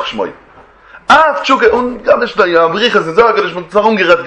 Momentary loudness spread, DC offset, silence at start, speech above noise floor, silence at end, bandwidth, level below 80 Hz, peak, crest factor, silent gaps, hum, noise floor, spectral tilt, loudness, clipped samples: 9 LU; under 0.1%; 0 s; 28 dB; 0 s; 9.8 kHz; -44 dBFS; 0 dBFS; 12 dB; none; none; -39 dBFS; -4.5 dB/octave; -10 LUFS; 0.4%